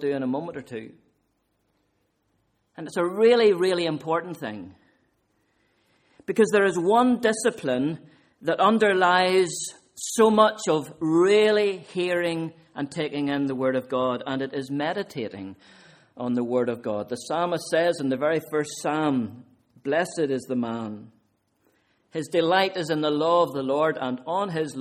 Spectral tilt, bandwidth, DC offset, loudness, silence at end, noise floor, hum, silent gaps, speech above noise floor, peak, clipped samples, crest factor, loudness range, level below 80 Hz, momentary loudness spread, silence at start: -4.5 dB/octave; 15.5 kHz; under 0.1%; -24 LUFS; 0 s; -72 dBFS; none; none; 48 dB; -4 dBFS; under 0.1%; 22 dB; 7 LU; -70 dBFS; 15 LU; 0 s